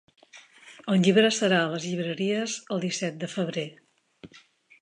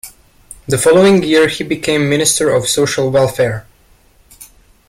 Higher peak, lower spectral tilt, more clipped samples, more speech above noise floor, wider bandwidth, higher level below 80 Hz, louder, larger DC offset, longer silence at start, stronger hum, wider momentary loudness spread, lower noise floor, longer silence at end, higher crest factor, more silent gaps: second, -8 dBFS vs 0 dBFS; about the same, -4.5 dB/octave vs -4 dB/octave; neither; second, 31 dB vs 37 dB; second, 10.5 kHz vs 16.5 kHz; second, -74 dBFS vs -46 dBFS; second, -26 LUFS vs -12 LUFS; neither; first, 0.35 s vs 0.05 s; neither; about the same, 11 LU vs 9 LU; first, -56 dBFS vs -49 dBFS; about the same, 0.45 s vs 0.45 s; first, 20 dB vs 14 dB; neither